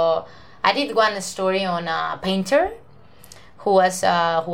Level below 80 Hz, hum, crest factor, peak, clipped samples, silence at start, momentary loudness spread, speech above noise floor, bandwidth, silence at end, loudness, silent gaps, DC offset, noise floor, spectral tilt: -54 dBFS; none; 20 dB; -2 dBFS; under 0.1%; 0 s; 6 LU; 29 dB; 16.5 kHz; 0 s; -21 LUFS; none; 0.4%; -49 dBFS; -4 dB/octave